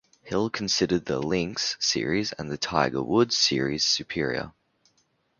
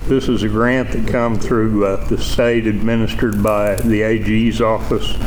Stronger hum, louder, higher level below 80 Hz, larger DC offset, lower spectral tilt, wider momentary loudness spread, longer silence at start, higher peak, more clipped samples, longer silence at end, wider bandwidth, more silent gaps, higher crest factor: neither; second, -25 LUFS vs -17 LUFS; second, -54 dBFS vs -26 dBFS; neither; second, -3.5 dB/octave vs -6.5 dB/octave; first, 8 LU vs 3 LU; first, 0.25 s vs 0 s; about the same, -4 dBFS vs -4 dBFS; neither; first, 0.9 s vs 0 s; second, 7.4 kHz vs over 20 kHz; neither; first, 22 dB vs 12 dB